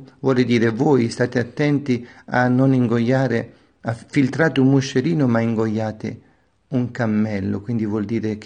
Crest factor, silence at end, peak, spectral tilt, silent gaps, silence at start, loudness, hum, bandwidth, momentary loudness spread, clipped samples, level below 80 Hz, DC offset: 16 dB; 0 s; -4 dBFS; -7.5 dB/octave; none; 0 s; -20 LUFS; none; 9.6 kHz; 9 LU; under 0.1%; -58 dBFS; under 0.1%